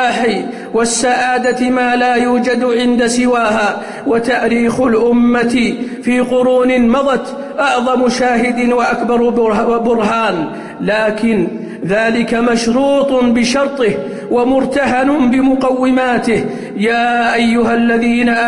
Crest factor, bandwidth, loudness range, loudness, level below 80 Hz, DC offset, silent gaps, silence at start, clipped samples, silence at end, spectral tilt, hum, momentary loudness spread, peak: 10 dB; 11 kHz; 1 LU; -13 LUFS; -44 dBFS; under 0.1%; none; 0 s; under 0.1%; 0 s; -4.5 dB/octave; none; 5 LU; -4 dBFS